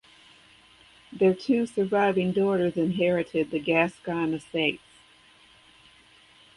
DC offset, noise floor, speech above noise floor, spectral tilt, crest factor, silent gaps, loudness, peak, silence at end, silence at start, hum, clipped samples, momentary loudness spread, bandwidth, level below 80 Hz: under 0.1%; -56 dBFS; 32 dB; -7 dB/octave; 20 dB; none; -25 LUFS; -8 dBFS; 1.8 s; 1.1 s; none; under 0.1%; 5 LU; 11.5 kHz; -64 dBFS